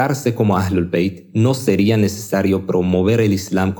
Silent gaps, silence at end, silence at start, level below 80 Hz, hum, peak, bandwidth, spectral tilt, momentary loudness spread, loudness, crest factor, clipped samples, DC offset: none; 0 s; 0 s; -50 dBFS; none; -2 dBFS; 19.5 kHz; -6.5 dB/octave; 4 LU; -17 LUFS; 16 dB; under 0.1%; under 0.1%